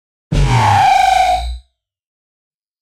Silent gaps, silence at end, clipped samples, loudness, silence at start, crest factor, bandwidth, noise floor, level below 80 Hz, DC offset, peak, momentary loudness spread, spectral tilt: none; 1.25 s; under 0.1%; -12 LUFS; 0.3 s; 14 dB; 15.5 kHz; -49 dBFS; -26 dBFS; under 0.1%; -2 dBFS; 11 LU; -5 dB/octave